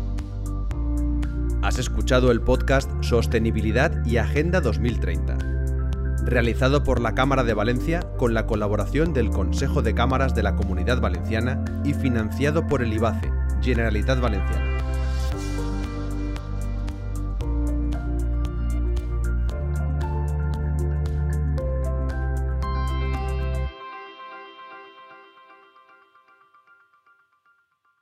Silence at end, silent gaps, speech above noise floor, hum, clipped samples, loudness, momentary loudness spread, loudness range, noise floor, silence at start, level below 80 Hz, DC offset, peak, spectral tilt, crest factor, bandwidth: 2.8 s; none; 45 dB; none; under 0.1%; -24 LUFS; 9 LU; 6 LU; -66 dBFS; 0 s; -26 dBFS; under 0.1%; -6 dBFS; -7 dB/octave; 18 dB; 13 kHz